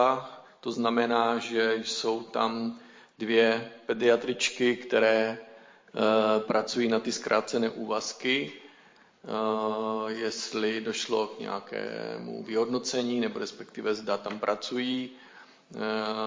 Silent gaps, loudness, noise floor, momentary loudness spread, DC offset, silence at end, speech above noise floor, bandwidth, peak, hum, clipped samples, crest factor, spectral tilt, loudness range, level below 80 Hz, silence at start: none; -29 LUFS; -58 dBFS; 12 LU; under 0.1%; 0 s; 30 dB; 7.6 kHz; -10 dBFS; none; under 0.1%; 20 dB; -3.5 dB/octave; 5 LU; -78 dBFS; 0 s